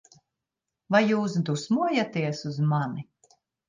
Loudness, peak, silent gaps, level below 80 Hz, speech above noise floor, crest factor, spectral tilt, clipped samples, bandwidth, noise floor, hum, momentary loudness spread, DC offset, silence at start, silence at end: -26 LUFS; -8 dBFS; none; -72 dBFS; 61 dB; 18 dB; -6.5 dB/octave; under 0.1%; 9.6 kHz; -86 dBFS; none; 8 LU; under 0.1%; 0.9 s; 0.65 s